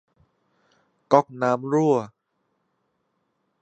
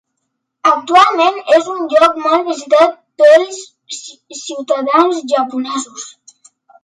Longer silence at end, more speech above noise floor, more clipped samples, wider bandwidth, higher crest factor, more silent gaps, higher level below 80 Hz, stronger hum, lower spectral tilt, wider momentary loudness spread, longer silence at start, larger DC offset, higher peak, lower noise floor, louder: first, 1.55 s vs 0.75 s; second, 53 dB vs 59 dB; neither; second, 8.4 kHz vs 11 kHz; first, 24 dB vs 14 dB; neither; second, -76 dBFS vs -62 dBFS; neither; first, -7.5 dB/octave vs -1.5 dB/octave; second, 5 LU vs 19 LU; first, 1.1 s vs 0.65 s; neither; about the same, -2 dBFS vs 0 dBFS; about the same, -74 dBFS vs -72 dBFS; second, -22 LUFS vs -12 LUFS